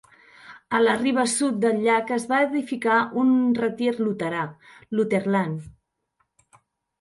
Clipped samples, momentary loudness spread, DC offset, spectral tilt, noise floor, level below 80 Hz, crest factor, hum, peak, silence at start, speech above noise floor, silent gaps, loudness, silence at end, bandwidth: under 0.1%; 8 LU; under 0.1%; -5 dB/octave; -73 dBFS; -64 dBFS; 18 dB; none; -6 dBFS; 0.45 s; 50 dB; none; -23 LUFS; 1.3 s; 11.5 kHz